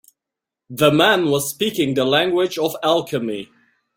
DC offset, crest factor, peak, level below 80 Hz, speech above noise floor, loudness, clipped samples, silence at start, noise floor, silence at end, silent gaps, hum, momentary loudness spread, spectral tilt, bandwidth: under 0.1%; 18 dB; -2 dBFS; -60 dBFS; 67 dB; -18 LUFS; under 0.1%; 0.7 s; -86 dBFS; 0.55 s; none; none; 10 LU; -4 dB/octave; 16.5 kHz